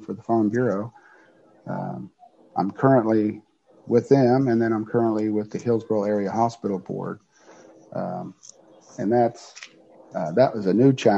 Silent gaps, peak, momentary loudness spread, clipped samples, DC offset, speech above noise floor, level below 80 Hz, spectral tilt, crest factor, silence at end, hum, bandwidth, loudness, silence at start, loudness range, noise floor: none; -4 dBFS; 20 LU; under 0.1%; under 0.1%; 33 dB; -68 dBFS; -8 dB/octave; 20 dB; 0 s; none; 8 kHz; -23 LUFS; 0 s; 7 LU; -55 dBFS